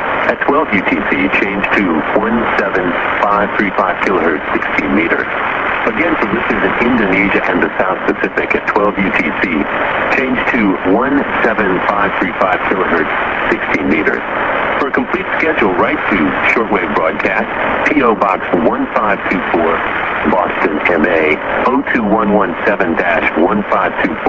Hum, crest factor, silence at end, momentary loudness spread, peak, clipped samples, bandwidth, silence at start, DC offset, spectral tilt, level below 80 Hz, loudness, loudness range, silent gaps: none; 14 dB; 0 s; 3 LU; 0 dBFS; under 0.1%; 8 kHz; 0 s; 0.3%; -7 dB/octave; -40 dBFS; -13 LUFS; 1 LU; none